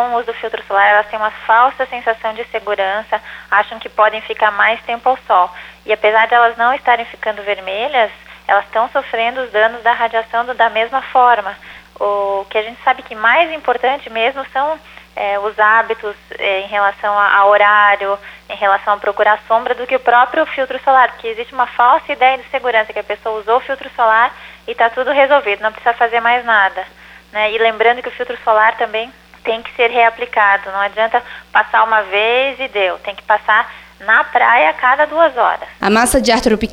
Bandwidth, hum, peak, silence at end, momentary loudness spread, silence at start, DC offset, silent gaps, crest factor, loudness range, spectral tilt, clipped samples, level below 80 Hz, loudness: 15.5 kHz; 60 Hz at -50 dBFS; 0 dBFS; 0 s; 10 LU; 0 s; under 0.1%; none; 14 dB; 3 LU; -2.5 dB/octave; under 0.1%; -46 dBFS; -14 LUFS